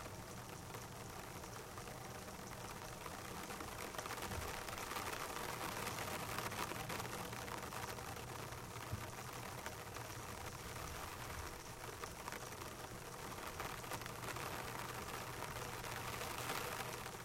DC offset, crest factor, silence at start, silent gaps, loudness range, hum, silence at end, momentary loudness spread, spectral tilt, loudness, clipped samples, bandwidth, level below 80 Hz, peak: under 0.1%; 22 dB; 0 s; none; 4 LU; none; 0 s; 7 LU; -3 dB/octave; -47 LUFS; under 0.1%; 16 kHz; -62 dBFS; -26 dBFS